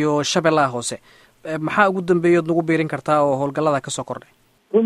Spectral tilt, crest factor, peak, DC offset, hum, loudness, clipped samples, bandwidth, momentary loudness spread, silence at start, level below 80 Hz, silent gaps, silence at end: -5 dB/octave; 18 dB; -2 dBFS; under 0.1%; none; -19 LUFS; under 0.1%; 12.5 kHz; 13 LU; 0 s; -60 dBFS; none; 0 s